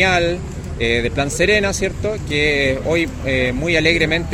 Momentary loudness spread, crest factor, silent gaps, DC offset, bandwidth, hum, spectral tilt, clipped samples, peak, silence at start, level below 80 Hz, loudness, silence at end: 7 LU; 16 dB; none; under 0.1%; 16 kHz; none; -4.5 dB/octave; under 0.1%; -2 dBFS; 0 s; -30 dBFS; -17 LUFS; 0 s